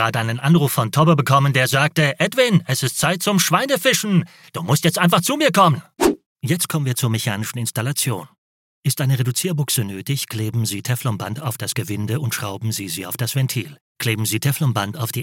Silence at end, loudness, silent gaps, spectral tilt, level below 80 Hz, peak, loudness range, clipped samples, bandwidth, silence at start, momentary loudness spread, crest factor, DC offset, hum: 0 s; -19 LUFS; 6.26-6.36 s, 8.38-8.83 s, 13.81-13.95 s; -4.5 dB/octave; -56 dBFS; -2 dBFS; 7 LU; under 0.1%; 17 kHz; 0 s; 9 LU; 18 dB; under 0.1%; none